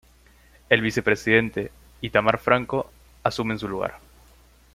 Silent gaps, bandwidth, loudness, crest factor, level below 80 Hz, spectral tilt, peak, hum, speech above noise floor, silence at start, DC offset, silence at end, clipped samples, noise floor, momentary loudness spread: none; 16 kHz; -23 LUFS; 24 dB; -52 dBFS; -5.5 dB/octave; -2 dBFS; none; 32 dB; 0.7 s; under 0.1%; 0.8 s; under 0.1%; -55 dBFS; 12 LU